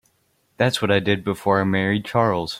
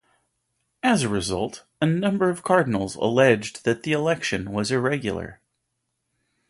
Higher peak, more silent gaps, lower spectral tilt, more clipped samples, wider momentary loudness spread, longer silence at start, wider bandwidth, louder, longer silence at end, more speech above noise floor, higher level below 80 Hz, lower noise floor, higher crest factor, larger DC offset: about the same, -4 dBFS vs -4 dBFS; neither; about the same, -6 dB/octave vs -5.5 dB/octave; neither; second, 3 LU vs 8 LU; second, 0.6 s vs 0.85 s; first, 15.5 kHz vs 11.5 kHz; about the same, -21 LUFS vs -23 LUFS; second, 0 s vs 1.15 s; second, 45 dB vs 55 dB; about the same, -56 dBFS vs -52 dBFS; second, -66 dBFS vs -77 dBFS; about the same, 18 dB vs 20 dB; neither